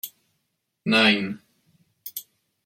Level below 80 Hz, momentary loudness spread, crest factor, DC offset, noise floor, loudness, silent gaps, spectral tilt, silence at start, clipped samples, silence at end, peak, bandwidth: -70 dBFS; 22 LU; 24 dB; under 0.1%; -76 dBFS; -21 LUFS; none; -4 dB/octave; 0.05 s; under 0.1%; 0.45 s; -4 dBFS; 16.5 kHz